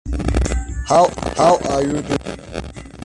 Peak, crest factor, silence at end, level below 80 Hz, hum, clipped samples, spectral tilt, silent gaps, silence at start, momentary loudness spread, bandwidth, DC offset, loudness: -2 dBFS; 16 dB; 0 s; -26 dBFS; none; under 0.1%; -5.5 dB/octave; none; 0.05 s; 15 LU; 11.5 kHz; under 0.1%; -18 LUFS